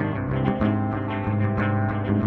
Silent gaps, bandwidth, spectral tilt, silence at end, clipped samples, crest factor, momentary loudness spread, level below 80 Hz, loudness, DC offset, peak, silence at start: none; 4.3 kHz; -10.5 dB/octave; 0 s; under 0.1%; 14 dB; 3 LU; -42 dBFS; -24 LUFS; under 0.1%; -10 dBFS; 0 s